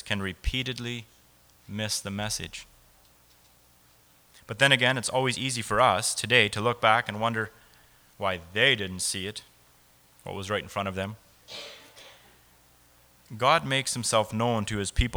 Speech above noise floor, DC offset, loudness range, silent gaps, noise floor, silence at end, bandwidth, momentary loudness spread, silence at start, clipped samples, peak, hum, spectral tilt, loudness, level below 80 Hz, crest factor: 33 dB; under 0.1%; 12 LU; none; -60 dBFS; 0 s; over 20 kHz; 19 LU; 0.05 s; under 0.1%; -4 dBFS; none; -3 dB/octave; -26 LUFS; -44 dBFS; 24 dB